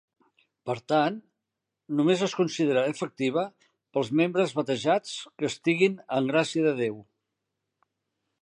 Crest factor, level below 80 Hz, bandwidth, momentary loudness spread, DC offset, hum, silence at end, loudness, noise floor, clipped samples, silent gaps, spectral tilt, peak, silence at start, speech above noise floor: 18 dB; -76 dBFS; 11 kHz; 10 LU; under 0.1%; none; 1.4 s; -27 LUFS; -85 dBFS; under 0.1%; none; -5.5 dB/octave; -8 dBFS; 0.65 s; 59 dB